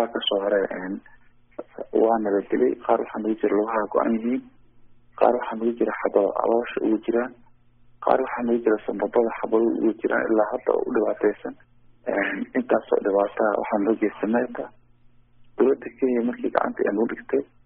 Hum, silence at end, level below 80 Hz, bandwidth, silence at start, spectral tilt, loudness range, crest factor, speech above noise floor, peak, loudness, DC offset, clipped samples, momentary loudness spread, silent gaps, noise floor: none; 0.2 s; -60 dBFS; 3.8 kHz; 0 s; -1 dB/octave; 2 LU; 20 dB; 31 dB; -4 dBFS; -24 LUFS; under 0.1%; under 0.1%; 8 LU; none; -54 dBFS